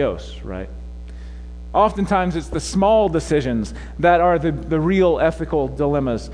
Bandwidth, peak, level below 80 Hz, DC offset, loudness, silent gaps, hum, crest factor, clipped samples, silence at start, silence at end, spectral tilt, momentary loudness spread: 10.5 kHz; -2 dBFS; -34 dBFS; under 0.1%; -19 LUFS; none; none; 16 dB; under 0.1%; 0 s; 0 s; -6.5 dB/octave; 20 LU